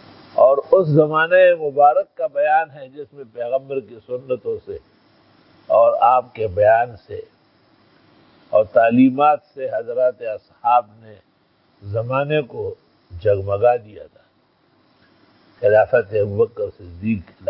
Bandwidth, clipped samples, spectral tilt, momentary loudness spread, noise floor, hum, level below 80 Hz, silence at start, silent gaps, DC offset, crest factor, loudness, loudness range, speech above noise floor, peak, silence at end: 5.6 kHz; under 0.1%; -11.5 dB/octave; 16 LU; -60 dBFS; none; -52 dBFS; 0.35 s; none; under 0.1%; 18 dB; -18 LUFS; 6 LU; 42 dB; 0 dBFS; 0 s